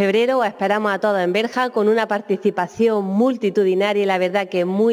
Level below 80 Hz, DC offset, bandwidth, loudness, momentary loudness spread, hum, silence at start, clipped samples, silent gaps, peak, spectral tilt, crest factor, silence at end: -70 dBFS; under 0.1%; 15.5 kHz; -19 LUFS; 3 LU; none; 0 s; under 0.1%; none; -6 dBFS; -6 dB/octave; 12 dB; 0 s